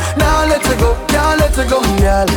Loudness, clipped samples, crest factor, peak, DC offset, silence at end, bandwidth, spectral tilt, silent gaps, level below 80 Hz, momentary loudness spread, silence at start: -13 LUFS; under 0.1%; 10 dB; -4 dBFS; under 0.1%; 0 s; 19 kHz; -5 dB/octave; none; -18 dBFS; 2 LU; 0 s